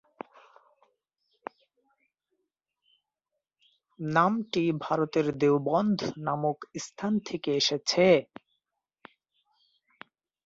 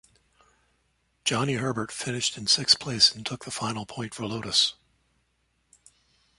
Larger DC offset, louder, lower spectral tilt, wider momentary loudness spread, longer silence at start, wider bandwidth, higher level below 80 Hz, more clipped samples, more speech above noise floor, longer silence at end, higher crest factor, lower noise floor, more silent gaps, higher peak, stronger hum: neither; about the same, -27 LUFS vs -25 LUFS; first, -5 dB/octave vs -2.5 dB/octave; first, 22 LU vs 14 LU; first, 4 s vs 1.25 s; second, 7.8 kHz vs 11.5 kHz; second, -70 dBFS vs -62 dBFS; neither; first, 60 dB vs 45 dB; first, 2.25 s vs 1.65 s; about the same, 22 dB vs 24 dB; first, -86 dBFS vs -72 dBFS; neither; about the same, -8 dBFS vs -6 dBFS; neither